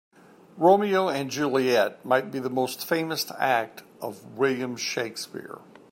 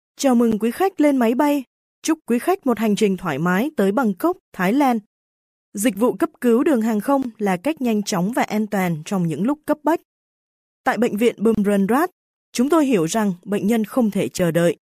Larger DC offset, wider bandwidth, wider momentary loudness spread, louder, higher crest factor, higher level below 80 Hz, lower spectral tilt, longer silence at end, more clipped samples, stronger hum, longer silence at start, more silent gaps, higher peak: neither; about the same, 16 kHz vs 15.5 kHz; first, 17 LU vs 6 LU; second, -25 LUFS vs -20 LUFS; about the same, 18 dB vs 16 dB; second, -76 dBFS vs -58 dBFS; second, -4 dB/octave vs -6 dB/octave; first, 0.35 s vs 0.2 s; neither; neither; first, 0.55 s vs 0.2 s; second, none vs 1.67-2.02 s, 4.40-4.52 s, 5.06-5.72 s, 10.05-10.84 s, 12.12-12.53 s; second, -8 dBFS vs -4 dBFS